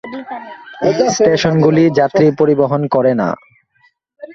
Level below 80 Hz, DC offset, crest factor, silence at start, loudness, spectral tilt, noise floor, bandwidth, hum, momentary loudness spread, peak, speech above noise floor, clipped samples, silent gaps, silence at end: -52 dBFS; under 0.1%; 14 dB; 0.05 s; -13 LUFS; -6 dB/octave; -57 dBFS; 7.8 kHz; none; 16 LU; 0 dBFS; 44 dB; under 0.1%; none; 0 s